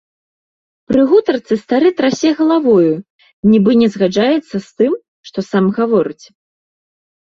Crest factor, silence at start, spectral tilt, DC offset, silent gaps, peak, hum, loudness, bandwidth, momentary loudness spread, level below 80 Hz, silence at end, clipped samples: 12 dB; 0.9 s; -6.5 dB/octave; under 0.1%; 3.10-3.19 s, 3.33-3.43 s, 5.08-5.24 s; -2 dBFS; none; -14 LUFS; 7.6 kHz; 11 LU; -54 dBFS; 1.1 s; under 0.1%